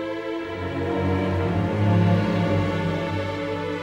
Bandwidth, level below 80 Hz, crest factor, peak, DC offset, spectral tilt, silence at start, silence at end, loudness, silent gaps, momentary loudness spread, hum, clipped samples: 8.4 kHz; -48 dBFS; 14 dB; -8 dBFS; under 0.1%; -8 dB/octave; 0 s; 0 s; -24 LUFS; none; 9 LU; none; under 0.1%